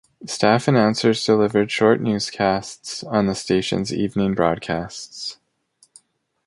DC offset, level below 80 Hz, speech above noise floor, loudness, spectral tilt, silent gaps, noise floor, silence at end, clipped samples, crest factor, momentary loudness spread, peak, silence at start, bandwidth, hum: under 0.1%; -52 dBFS; 40 dB; -20 LUFS; -5 dB/octave; none; -60 dBFS; 1.15 s; under 0.1%; 18 dB; 13 LU; -2 dBFS; 0.2 s; 11.5 kHz; none